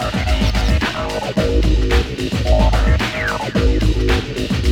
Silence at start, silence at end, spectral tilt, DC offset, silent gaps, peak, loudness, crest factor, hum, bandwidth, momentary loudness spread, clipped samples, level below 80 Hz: 0 s; 0 s; -6 dB/octave; under 0.1%; none; -2 dBFS; -18 LUFS; 14 dB; none; 15 kHz; 5 LU; under 0.1%; -18 dBFS